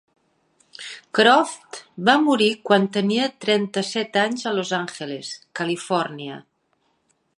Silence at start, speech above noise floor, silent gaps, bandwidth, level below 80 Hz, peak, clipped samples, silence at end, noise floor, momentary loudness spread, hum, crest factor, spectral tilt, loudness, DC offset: 0.8 s; 47 dB; none; 11.5 kHz; -74 dBFS; -2 dBFS; under 0.1%; 0.95 s; -68 dBFS; 19 LU; none; 22 dB; -4 dB/octave; -21 LUFS; under 0.1%